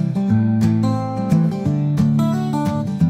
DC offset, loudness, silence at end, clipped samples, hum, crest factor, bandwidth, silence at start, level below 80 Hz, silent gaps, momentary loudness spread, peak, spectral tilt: under 0.1%; -18 LUFS; 0 s; under 0.1%; none; 12 dB; 13.5 kHz; 0 s; -46 dBFS; none; 4 LU; -6 dBFS; -8.5 dB/octave